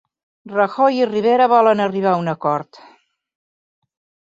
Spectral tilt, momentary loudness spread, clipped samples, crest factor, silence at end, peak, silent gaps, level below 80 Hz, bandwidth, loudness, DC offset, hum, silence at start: -7 dB/octave; 9 LU; under 0.1%; 16 dB; 1.7 s; -2 dBFS; none; -68 dBFS; 7.8 kHz; -17 LUFS; under 0.1%; none; 0.45 s